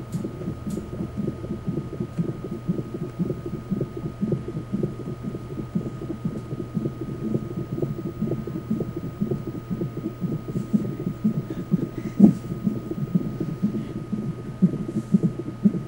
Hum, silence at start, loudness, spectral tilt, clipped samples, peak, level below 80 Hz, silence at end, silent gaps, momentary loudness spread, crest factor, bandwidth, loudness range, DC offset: none; 0 s; -27 LUFS; -9.5 dB/octave; under 0.1%; -2 dBFS; -48 dBFS; 0 s; none; 8 LU; 26 dB; 16 kHz; 6 LU; under 0.1%